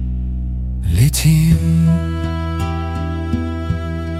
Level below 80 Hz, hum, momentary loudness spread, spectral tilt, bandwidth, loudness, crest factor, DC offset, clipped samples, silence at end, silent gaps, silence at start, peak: -24 dBFS; none; 10 LU; -6 dB/octave; 16 kHz; -18 LUFS; 16 dB; under 0.1%; under 0.1%; 0 s; none; 0 s; -2 dBFS